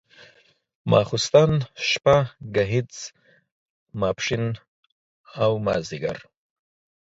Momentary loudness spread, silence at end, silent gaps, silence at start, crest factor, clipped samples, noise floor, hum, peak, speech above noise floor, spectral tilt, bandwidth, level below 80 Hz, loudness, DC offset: 19 LU; 0.9 s; 3.52-3.87 s, 4.68-4.83 s, 4.92-5.24 s; 0.85 s; 22 dB; under 0.1%; -59 dBFS; none; -4 dBFS; 37 dB; -5 dB/octave; 7.8 kHz; -52 dBFS; -22 LUFS; under 0.1%